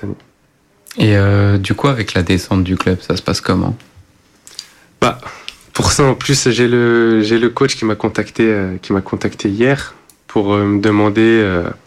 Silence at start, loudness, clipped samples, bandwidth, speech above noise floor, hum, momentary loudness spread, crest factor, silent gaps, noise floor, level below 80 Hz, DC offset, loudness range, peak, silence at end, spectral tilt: 0 s; -14 LUFS; under 0.1%; 14 kHz; 41 dB; none; 17 LU; 14 dB; none; -55 dBFS; -40 dBFS; under 0.1%; 4 LU; -2 dBFS; 0.1 s; -5.5 dB/octave